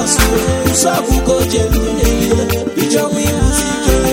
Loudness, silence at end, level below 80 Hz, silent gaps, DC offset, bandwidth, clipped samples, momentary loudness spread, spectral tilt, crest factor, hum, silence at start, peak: -13 LUFS; 0 s; -20 dBFS; none; under 0.1%; 19 kHz; under 0.1%; 3 LU; -4.5 dB/octave; 12 dB; none; 0 s; 0 dBFS